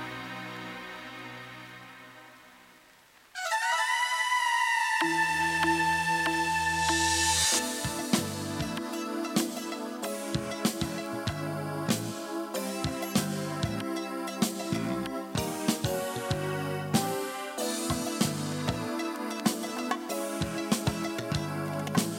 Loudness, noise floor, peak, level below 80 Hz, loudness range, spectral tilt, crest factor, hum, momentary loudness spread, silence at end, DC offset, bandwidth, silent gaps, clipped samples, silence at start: -30 LUFS; -58 dBFS; -12 dBFS; -54 dBFS; 7 LU; -3.5 dB/octave; 20 dB; none; 13 LU; 0 s; under 0.1%; 17 kHz; none; under 0.1%; 0 s